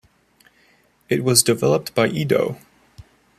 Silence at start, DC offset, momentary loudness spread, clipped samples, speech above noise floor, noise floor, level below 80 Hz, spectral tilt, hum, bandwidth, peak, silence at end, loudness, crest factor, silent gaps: 1.1 s; under 0.1%; 10 LU; under 0.1%; 40 dB; -58 dBFS; -58 dBFS; -4 dB/octave; none; 14.5 kHz; 0 dBFS; 0.85 s; -19 LUFS; 22 dB; none